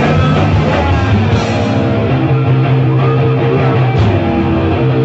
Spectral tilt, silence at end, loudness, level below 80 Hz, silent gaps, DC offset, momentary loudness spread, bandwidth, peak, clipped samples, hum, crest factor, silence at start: -8 dB/octave; 0 s; -12 LUFS; -26 dBFS; none; under 0.1%; 2 LU; 7.8 kHz; -2 dBFS; under 0.1%; none; 8 dB; 0 s